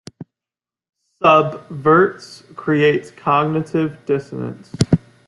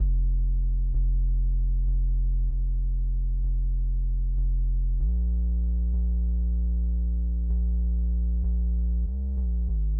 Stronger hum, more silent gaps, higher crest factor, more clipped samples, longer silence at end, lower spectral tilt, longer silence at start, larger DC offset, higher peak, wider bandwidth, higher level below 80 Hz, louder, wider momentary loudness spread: neither; neither; first, 18 dB vs 8 dB; neither; first, 0.3 s vs 0 s; second, -6.5 dB/octave vs -17 dB/octave; first, 0.2 s vs 0 s; neither; first, 0 dBFS vs -16 dBFS; first, 11.5 kHz vs 0.8 kHz; second, -50 dBFS vs -24 dBFS; first, -17 LUFS vs -28 LUFS; first, 15 LU vs 2 LU